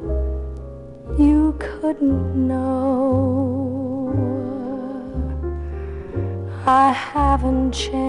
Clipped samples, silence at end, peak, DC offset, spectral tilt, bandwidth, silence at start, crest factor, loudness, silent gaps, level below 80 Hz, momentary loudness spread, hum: under 0.1%; 0 s; -4 dBFS; under 0.1%; -7 dB/octave; 11 kHz; 0 s; 16 dB; -21 LUFS; none; -28 dBFS; 13 LU; none